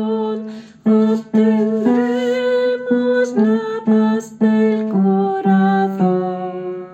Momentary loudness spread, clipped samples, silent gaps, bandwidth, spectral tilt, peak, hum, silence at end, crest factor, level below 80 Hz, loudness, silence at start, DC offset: 8 LU; under 0.1%; none; 8.2 kHz; -8 dB/octave; -4 dBFS; none; 0 s; 12 dB; -66 dBFS; -16 LUFS; 0 s; under 0.1%